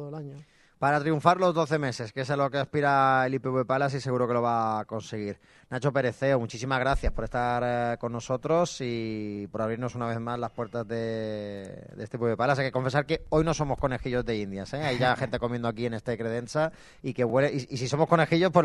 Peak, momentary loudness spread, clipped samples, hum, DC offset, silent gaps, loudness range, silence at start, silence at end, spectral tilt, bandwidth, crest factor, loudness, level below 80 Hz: -4 dBFS; 11 LU; under 0.1%; none; under 0.1%; none; 5 LU; 0 s; 0 s; -6 dB/octave; 11.5 kHz; 22 dB; -28 LUFS; -46 dBFS